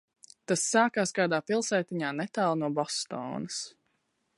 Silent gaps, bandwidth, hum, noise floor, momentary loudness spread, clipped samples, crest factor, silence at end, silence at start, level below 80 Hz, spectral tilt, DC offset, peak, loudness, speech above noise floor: none; 11.5 kHz; none; -76 dBFS; 11 LU; under 0.1%; 20 dB; 0.7 s; 0.5 s; -78 dBFS; -3.5 dB/octave; under 0.1%; -10 dBFS; -29 LUFS; 47 dB